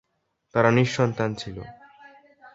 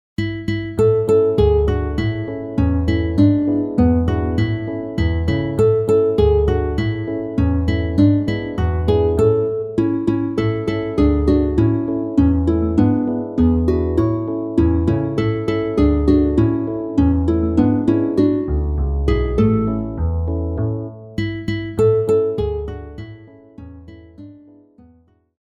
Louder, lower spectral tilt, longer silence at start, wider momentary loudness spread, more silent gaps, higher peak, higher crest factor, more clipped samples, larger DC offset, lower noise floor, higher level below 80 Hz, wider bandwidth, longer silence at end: second, -23 LUFS vs -18 LUFS; second, -6.5 dB/octave vs -9.5 dB/octave; first, 0.55 s vs 0.2 s; first, 19 LU vs 8 LU; neither; about the same, -2 dBFS vs -2 dBFS; first, 22 dB vs 16 dB; neither; neither; first, -74 dBFS vs -53 dBFS; second, -56 dBFS vs -26 dBFS; second, 7.8 kHz vs 10.5 kHz; second, 0.05 s vs 1.05 s